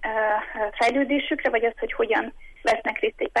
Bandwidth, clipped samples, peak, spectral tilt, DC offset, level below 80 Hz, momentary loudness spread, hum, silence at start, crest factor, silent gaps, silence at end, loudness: 11.5 kHz; under 0.1%; -10 dBFS; -3.5 dB/octave; under 0.1%; -48 dBFS; 5 LU; none; 0 s; 14 dB; none; 0 s; -24 LUFS